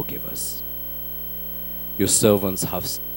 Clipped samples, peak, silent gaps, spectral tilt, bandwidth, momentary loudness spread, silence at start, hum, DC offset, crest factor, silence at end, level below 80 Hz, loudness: under 0.1%; -4 dBFS; none; -4 dB/octave; 17.5 kHz; 11 LU; 0 s; 60 Hz at -40 dBFS; 0.3%; 22 dB; 0 s; -46 dBFS; -22 LUFS